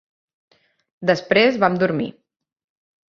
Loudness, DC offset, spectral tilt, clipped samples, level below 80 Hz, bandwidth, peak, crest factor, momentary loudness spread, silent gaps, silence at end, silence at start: -18 LUFS; under 0.1%; -6 dB/octave; under 0.1%; -64 dBFS; 7.2 kHz; -2 dBFS; 20 dB; 10 LU; none; 1 s; 1 s